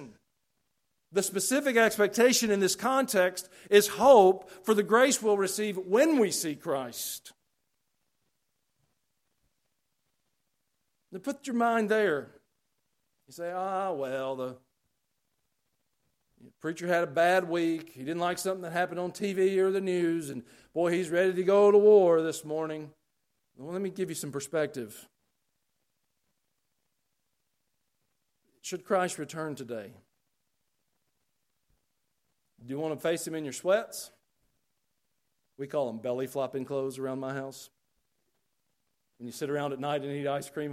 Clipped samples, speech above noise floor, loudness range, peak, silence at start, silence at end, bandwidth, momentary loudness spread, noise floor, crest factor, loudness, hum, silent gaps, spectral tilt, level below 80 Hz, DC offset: under 0.1%; 54 dB; 15 LU; -6 dBFS; 0 s; 0 s; 16 kHz; 17 LU; -81 dBFS; 24 dB; -28 LUFS; none; none; -4 dB/octave; -76 dBFS; under 0.1%